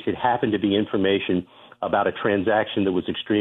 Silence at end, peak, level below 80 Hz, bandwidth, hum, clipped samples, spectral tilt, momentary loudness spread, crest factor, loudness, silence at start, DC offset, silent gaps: 0 s; -8 dBFS; -58 dBFS; 4 kHz; none; under 0.1%; -9 dB/octave; 5 LU; 14 dB; -23 LUFS; 0 s; under 0.1%; none